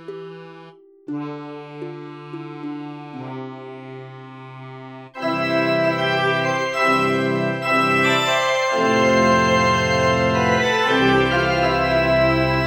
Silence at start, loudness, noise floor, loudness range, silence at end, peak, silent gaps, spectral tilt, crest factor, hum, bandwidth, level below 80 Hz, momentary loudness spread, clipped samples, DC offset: 0 s; -18 LUFS; -45 dBFS; 16 LU; 0 s; -4 dBFS; none; -5 dB/octave; 16 dB; none; 16 kHz; -44 dBFS; 20 LU; under 0.1%; under 0.1%